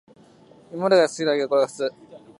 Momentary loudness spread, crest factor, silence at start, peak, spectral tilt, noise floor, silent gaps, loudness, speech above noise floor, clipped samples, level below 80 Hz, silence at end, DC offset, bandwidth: 11 LU; 18 dB; 0.7 s; -6 dBFS; -4.5 dB/octave; -51 dBFS; none; -22 LUFS; 31 dB; under 0.1%; -74 dBFS; 0.25 s; under 0.1%; 11.5 kHz